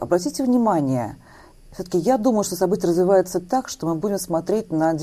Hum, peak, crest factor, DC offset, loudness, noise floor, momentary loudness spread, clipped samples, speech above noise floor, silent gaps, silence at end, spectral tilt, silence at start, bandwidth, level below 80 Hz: none; -6 dBFS; 16 dB; under 0.1%; -21 LUFS; -46 dBFS; 7 LU; under 0.1%; 26 dB; none; 0 s; -6 dB/octave; 0 s; 15 kHz; -52 dBFS